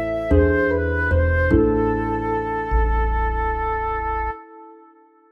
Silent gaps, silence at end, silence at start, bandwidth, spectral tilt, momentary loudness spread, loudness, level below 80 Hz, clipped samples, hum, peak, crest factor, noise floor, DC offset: none; 0.55 s; 0 s; 5.2 kHz; -9.5 dB/octave; 6 LU; -21 LUFS; -26 dBFS; under 0.1%; none; -4 dBFS; 16 dB; -51 dBFS; under 0.1%